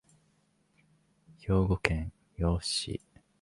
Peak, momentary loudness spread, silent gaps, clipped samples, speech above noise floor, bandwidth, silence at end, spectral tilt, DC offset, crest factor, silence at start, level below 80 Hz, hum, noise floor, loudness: -6 dBFS; 14 LU; none; under 0.1%; 41 dB; 11.5 kHz; 0.45 s; -5 dB/octave; under 0.1%; 28 dB; 1.3 s; -42 dBFS; none; -71 dBFS; -31 LUFS